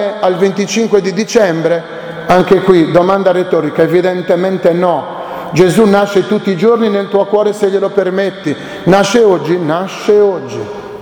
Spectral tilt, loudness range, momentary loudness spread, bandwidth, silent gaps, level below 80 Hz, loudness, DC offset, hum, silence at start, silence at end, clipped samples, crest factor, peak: -6 dB/octave; 1 LU; 9 LU; 18 kHz; none; -48 dBFS; -11 LUFS; under 0.1%; none; 0 s; 0 s; 0.3%; 12 dB; 0 dBFS